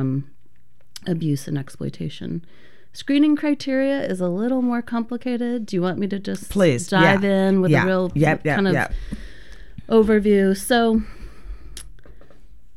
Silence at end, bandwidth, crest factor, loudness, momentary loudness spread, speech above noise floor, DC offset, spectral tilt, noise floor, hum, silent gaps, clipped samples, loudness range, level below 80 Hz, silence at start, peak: 0.65 s; 15.5 kHz; 18 dB; -20 LUFS; 17 LU; 40 dB; 2%; -6.5 dB/octave; -60 dBFS; none; none; under 0.1%; 5 LU; -42 dBFS; 0 s; -2 dBFS